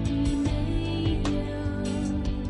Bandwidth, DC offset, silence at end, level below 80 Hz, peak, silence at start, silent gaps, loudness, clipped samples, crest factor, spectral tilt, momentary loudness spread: 11.5 kHz; under 0.1%; 0 s; -32 dBFS; -14 dBFS; 0 s; none; -28 LUFS; under 0.1%; 12 dB; -7 dB/octave; 3 LU